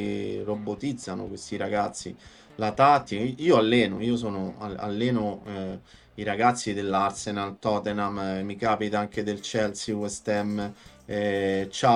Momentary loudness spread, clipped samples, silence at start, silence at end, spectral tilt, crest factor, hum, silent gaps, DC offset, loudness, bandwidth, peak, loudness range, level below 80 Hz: 13 LU; under 0.1%; 0 s; 0 s; -5 dB/octave; 20 dB; none; none; under 0.1%; -27 LUFS; 11.5 kHz; -6 dBFS; 4 LU; -58 dBFS